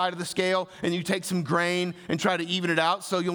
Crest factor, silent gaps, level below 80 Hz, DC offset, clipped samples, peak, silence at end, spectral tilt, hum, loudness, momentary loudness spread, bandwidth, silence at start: 16 dB; none; -68 dBFS; under 0.1%; under 0.1%; -10 dBFS; 0 s; -4.5 dB/octave; none; -26 LUFS; 5 LU; over 20 kHz; 0 s